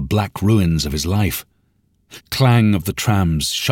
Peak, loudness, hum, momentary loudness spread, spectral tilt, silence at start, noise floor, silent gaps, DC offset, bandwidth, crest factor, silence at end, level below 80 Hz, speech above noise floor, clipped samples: -4 dBFS; -18 LUFS; none; 7 LU; -5.5 dB/octave; 0 s; -62 dBFS; none; under 0.1%; 17 kHz; 14 dB; 0 s; -34 dBFS; 45 dB; under 0.1%